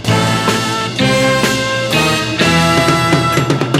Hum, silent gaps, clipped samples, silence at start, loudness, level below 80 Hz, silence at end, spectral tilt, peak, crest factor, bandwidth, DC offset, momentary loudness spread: none; none; under 0.1%; 0 s; -12 LUFS; -38 dBFS; 0 s; -4.5 dB/octave; 0 dBFS; 12 dB; 16 kHz; under 0.1%; 4 LU